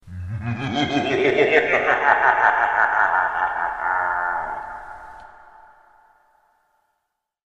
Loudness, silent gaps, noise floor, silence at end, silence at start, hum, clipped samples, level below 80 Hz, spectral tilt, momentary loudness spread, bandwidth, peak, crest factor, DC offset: -19 LUFS; none; -77 dBFS; 2.25 s; 0.05 s; none; under 0.1%; -52 dBFS; -5.5 dB/octave; 16 LU; 8.2 kHz; 0 dBFS; 22 dB; under 0.1%